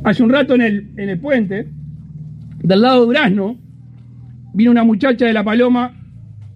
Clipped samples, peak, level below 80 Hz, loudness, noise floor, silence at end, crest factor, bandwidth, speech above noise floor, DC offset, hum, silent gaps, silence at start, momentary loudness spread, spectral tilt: under 0.1%; -2 dBFS; -48 dBFS; -14 LUFS; -38 dBFS; 0.05 s; 14 dB; 5.6 kHz; 24 dB; under 0.1%; none; none; 0 s; 21 LU; -8 dB/octave